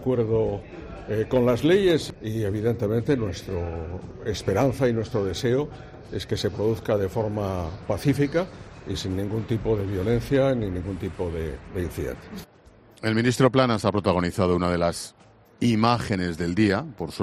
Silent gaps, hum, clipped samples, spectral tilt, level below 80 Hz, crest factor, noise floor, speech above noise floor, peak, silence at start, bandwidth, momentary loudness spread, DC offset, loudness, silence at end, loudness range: none; none; under 0.1%; -6.5 dB/octave; -46 dBFS; 20 dB; -52 dBFS; 28 dB; -6 dBFS; 0 s; 14 kHz; 13 LU; under 0.1%; -25 LUFS; 0 s; 3 LU